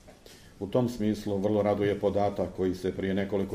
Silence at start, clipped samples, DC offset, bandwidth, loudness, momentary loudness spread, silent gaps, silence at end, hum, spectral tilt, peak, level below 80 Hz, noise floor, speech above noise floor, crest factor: 0.05 s; under 0.1%; under 0.1%; 15.5 kHz; -29 LUFS; 4 LU; none; 0 s; none; -7.5 dB/octave; -12 dBFS; -54 dBFS; -52 dBFS; 24 dB; 16 dB